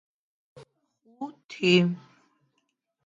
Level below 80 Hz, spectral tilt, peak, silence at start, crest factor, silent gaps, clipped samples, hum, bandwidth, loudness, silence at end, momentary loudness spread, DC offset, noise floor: -76 dBFS; -6 dB/octave; -8 dBFS; 1.2 s; 22 dB; 1.44-1.49 s; under 0.1%; none; 7.6 kHz; -23 LUFS; 1.1 s; 19 LU; under 0.1%; -77 dBFS